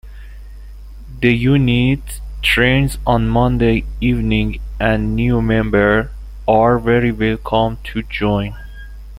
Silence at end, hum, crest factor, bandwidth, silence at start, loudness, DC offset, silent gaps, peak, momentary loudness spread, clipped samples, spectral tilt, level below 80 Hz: 0 s; 50 Hz at -25 dBFS; 16 dB; 16 kHz; 0.05 s; -16 LUFS; under 0.1%; none; 0 dBFS; 11 LU; under 0.1%; -7 dB/octave; -28 dBFS